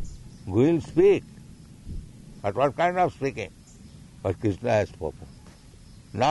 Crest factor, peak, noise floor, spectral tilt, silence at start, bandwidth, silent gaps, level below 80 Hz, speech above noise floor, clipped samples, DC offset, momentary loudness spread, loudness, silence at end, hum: 18 dB; -10 dBFS; -48 dBFS; -7 dB/octave; 0 s; 11.5 kHz; none; -48 dBFS; 25 dB; under 0.1%; under 0.1%; 23 LU; -25 LUFS; 0 s; none